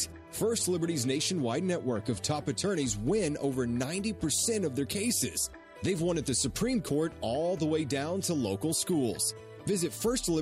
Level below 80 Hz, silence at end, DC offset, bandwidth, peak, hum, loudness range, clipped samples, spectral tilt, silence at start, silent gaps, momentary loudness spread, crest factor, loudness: -54 dBFS; 0 s; under 0.1%; 15.5 kHz; -16 dBFS; none; 1 LU; under 0.1%; -4 dB/octave; 0 s; none; 4 LU; 14 dB; -31 LUFS